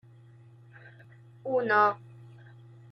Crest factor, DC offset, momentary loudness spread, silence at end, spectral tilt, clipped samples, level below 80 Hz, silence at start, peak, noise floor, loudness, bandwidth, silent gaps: 20 dB; under 0.1%; 28 LU; 0.7 s; -7 dB/octave; under 0.1%; -78 dBFS; 0.85 s; -12 dBFS; -54 dBFS; -26 LUFS; 6.4 kHz; none